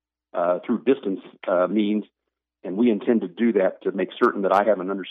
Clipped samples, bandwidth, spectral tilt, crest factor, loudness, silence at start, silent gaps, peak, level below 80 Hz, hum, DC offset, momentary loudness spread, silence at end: under 0.1%; 6.2 kHz; -8 dB/octave; 16 dB; -23 LUFS; 0.35 s; none; -6 dBFS; -78 dBFS; none; under 0.1%; 10 LU; 0 s